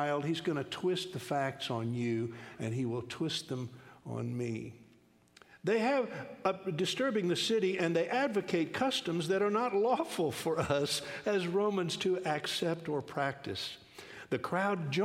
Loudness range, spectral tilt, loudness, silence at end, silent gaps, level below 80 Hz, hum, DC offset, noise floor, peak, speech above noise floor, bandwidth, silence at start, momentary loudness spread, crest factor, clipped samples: 6 LU; -5 dB/octave; -34 LUFS; 0 s; none; -72 dBFS; none; under 0.1%; -64 dBFS; -16 dBFS; 31 dB; 16 kHz; 0 s; 9 LU; 18 dB; under 0.1%